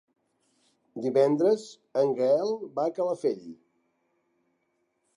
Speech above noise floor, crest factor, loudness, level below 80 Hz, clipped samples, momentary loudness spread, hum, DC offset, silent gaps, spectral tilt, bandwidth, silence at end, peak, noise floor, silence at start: 49 dB; 18 dB; -27 LUFS; -84 dBFS; under 0.1%; 10 LU; none; under 0.1%; none; -6.5 dB/octave; 11 kHz; 1.6 s; -10 dBFS; -75 dBFS; 0.95 s